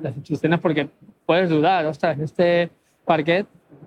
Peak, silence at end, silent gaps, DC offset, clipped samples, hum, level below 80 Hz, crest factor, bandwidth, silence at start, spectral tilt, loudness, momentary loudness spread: -4 dBFS; 0 s; none; under 0.1%; under 0.1%; none; -64 dBFS; 18 dB; 9.4 kHz; 0 s; -7.5 dB/octave; -21 LUFS; 12 LU